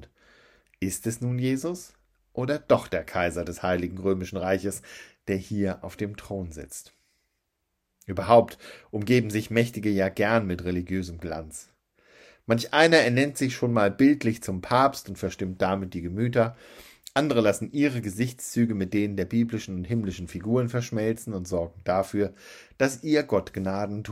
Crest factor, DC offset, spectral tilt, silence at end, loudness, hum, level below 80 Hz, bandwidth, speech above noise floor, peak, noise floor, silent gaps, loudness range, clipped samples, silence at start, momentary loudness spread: 22 dB; under 0.1%; -5.5 dB/octave; 0 s; -26 LUFS; none; -58 dBFS; 16 kHz; 53 dB; -4 dBFS; -79 dBFS; none; 6 LU; under 0.1%; 0 s; 14 LU